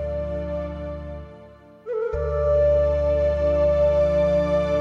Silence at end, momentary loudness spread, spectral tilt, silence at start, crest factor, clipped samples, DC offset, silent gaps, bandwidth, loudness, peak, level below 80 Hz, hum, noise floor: 0 s; 14 LU; -8.5 dB/octave; 0 s; 12 dB; under 0.1%; under 0.1%; none; 6.8 kHz; -22 LUFS; -10 dBFS; -32 dBFS; none; -46 dBFS